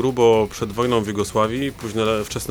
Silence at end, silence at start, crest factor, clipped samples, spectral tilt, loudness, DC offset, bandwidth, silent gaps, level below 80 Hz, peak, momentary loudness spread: 0 s; 0 s; 14 dB; under 0.1%; -5 dB/octave; -20 LUFS; under 0.1%; over 20 kHz; none; -44 dBFS; -4 dBFS; 8 LU